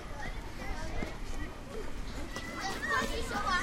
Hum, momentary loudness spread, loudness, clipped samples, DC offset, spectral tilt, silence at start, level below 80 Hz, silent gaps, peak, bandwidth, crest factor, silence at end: none; 11 LU; -37 LUFS; under 0.1%; under 0.1%; -3.5 dB/octave; 0 s; -40 dBFS; none; -18 dBFS; 16 kHz; 16 dB; 0 s